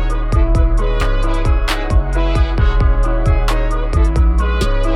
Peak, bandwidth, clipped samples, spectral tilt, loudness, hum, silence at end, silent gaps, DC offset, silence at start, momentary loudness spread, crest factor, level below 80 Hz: -2 dBFS; 11 kHz; under 0.1%; -6.5 dB/octave; -17 LUFS; none; 0 s; none; under 0.1%; 0 s; 3 LU; 10 dB; -14 dBFS